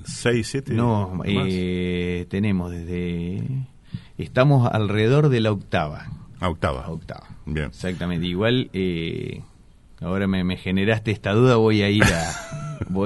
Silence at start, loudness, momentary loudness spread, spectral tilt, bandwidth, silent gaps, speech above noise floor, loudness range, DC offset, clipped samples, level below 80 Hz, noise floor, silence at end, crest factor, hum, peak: 0 s; -22 LUFS; 16 LU; -6.5 dB/octave; 11.5 kHz; none; 27 dB; 5 LU; under 0.1%; under 0.1%; -42 dBFS; -49 dBFS; 0 s; 22 dB; none; 0 dBFS